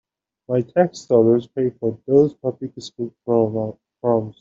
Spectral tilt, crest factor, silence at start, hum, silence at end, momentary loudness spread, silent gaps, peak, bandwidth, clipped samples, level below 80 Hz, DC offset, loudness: -8 dB/octave; 16 dB; 0.5 s; none; 0.1 s; 14 LU; none; -4 dBFS; 7.6 kHz; under 0.1%; -60 dBFS; under 0.1%; -20 LUFS